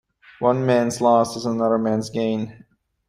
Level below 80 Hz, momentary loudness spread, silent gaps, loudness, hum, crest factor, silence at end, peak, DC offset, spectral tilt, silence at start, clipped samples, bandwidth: -60 dBFS; 7 LU; none; -21 LUFS; none; 18 dB; 0.55 s; -4 dBFS; under 0.1%; -6 dB/octave; 0.4 s; under 0.1%; 14 kHz